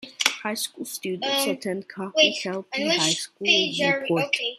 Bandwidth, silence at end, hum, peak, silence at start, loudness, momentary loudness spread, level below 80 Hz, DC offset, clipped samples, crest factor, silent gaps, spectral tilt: 15 kHz; 0 s; none; -2 dBFS; 0 s; -23 LUFS; 10 LU; -72 dBFS; under 0.1%; under 0.1%; 24 dB; none; -2.5 dB/octave